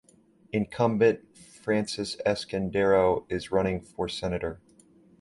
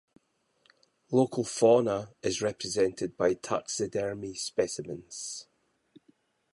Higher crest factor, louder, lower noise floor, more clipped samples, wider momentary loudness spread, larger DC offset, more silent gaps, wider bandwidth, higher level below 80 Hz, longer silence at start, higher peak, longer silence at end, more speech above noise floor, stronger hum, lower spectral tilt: about the same, 18 dB vs 20 dB; about the same, -27 LUFS vs -29 LUFS; second, -60 dBFS vs -70 dBFS; neither; second, 11 LU vs 14 LU; neither; neither; about the same, 11.5 kHz vs 11.5 kHz; first, -52 dBFS vs -64 dBFS; second, 0.55 s vs 1.1 s; about the same, -10 dBFS vs -10 dBFS; second, 0.65 s vs 1.1 s; second, 33 dB vs 42 dB; neither; first, -6 dB/octave vs -4.5 dB/octave